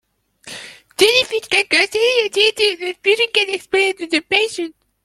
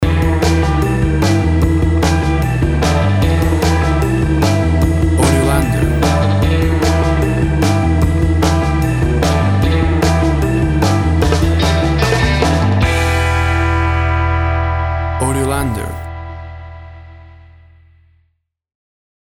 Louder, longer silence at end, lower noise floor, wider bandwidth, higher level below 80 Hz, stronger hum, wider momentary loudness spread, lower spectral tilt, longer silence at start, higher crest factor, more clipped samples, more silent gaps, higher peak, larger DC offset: about the same, -15 LUFS vs -14 LUFS; second, 0.35 s vs 2.05 s; second, -42 dBFS vs -64 dBFS; about the same, 14 kHz vs 14.5 kHz; second, -60 dBFS vs -20 dBFS; neither; first, 17 LU vs 4 LU; second, -1 dB/octave vs -6 dB/octave; first, 0.45 s vs 0 s; about the same, 18 dB vs 14 dB; neither; neither; about the same, 0 dBFS vs 0 dBFS; neither